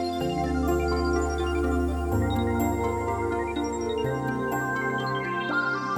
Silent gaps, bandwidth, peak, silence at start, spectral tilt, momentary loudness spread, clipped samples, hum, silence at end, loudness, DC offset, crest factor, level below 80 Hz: none; over 20 kHz; -12 dBFS; 0 s; -6 dB/octave; 3 LU; under 0.1%; none; 0 s; -27 LUFS; under 0.1%; 14 dB; -36 dBFS